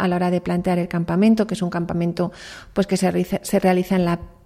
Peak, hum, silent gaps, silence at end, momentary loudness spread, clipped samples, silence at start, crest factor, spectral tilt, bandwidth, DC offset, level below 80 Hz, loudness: -4 dBFS; none; none; 0.15 s; 7 LU; under 0.1%; 0 s; 16 dB; -6.5 dB/octave; 15.5 kHz; under 0.1%; -48 dBFS; -21 LUFS